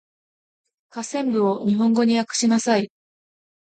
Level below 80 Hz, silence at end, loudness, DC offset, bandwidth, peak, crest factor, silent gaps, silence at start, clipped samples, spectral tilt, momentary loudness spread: -70 dBFS; 0.75 s; -20 LUFS; under 0.1%; 9.2 kHz; -8 dBFS; 14 dB; none; 0.95 s; under 0.1%; -4.5 dB/octave; 14 LU